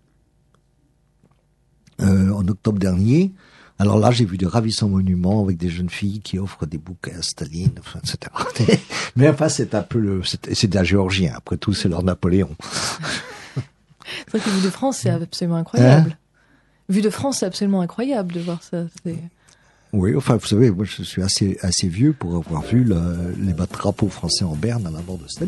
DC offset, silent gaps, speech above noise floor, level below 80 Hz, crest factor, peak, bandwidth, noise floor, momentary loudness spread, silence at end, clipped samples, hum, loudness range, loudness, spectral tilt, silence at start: under 0.1%; none; 41 dB; -44 dBFS; 20 dB; 0 dBFS; 12 kHz; -61 dBFS; 12 LU; 0 s; under 0.1%; none; 5 LU; -20 LUFS; -6 dB/octave; 2 s